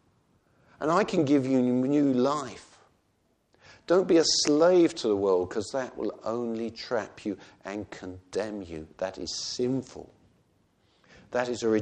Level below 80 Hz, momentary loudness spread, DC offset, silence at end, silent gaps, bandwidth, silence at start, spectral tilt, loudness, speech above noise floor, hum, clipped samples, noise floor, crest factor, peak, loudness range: -64 dBFS; 17 LU; under 0.1%; 0 s; none; 9.8 kHz; 0.8 s; -4.5 dB/octave; -27 LUFS; 44 dB; none; under 0.1%; -70 dBFS; 18 dB; -10 dBFS; 10 LU